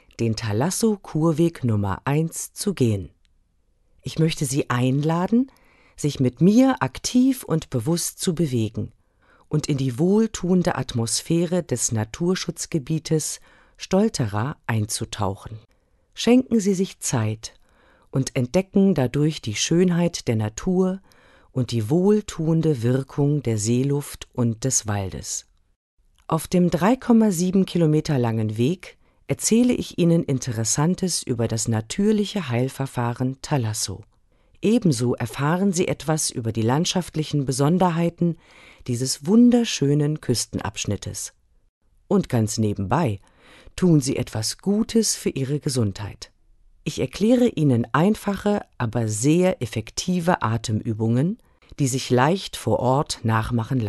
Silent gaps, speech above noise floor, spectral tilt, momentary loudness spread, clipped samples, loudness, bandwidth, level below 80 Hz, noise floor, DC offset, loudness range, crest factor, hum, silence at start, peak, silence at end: 25.76-25.97 s, 41.69-41.81 s; 42 dB; -5.5 dB/octave; 9 LU; under 0.1%; -22 LUFS; 12.5 kHz; -48 dBFS; -63 dBFS; under 0.1%; 4 LU; 18 dB; none; 0.2 s; -4 dBFS; 0 s